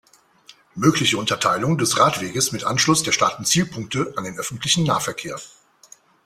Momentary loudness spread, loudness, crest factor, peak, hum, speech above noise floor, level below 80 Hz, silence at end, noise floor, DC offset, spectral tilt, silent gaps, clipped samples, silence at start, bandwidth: 11 LU; -20 LUFS; 20 dB; -2 dBFS; none; 31 dB; -56 dBFS; 0.8 s; -51 dBFS; under 0.1%; -3.5 dB/octave; none; under 0.1%; 0.75 s; 16 kHz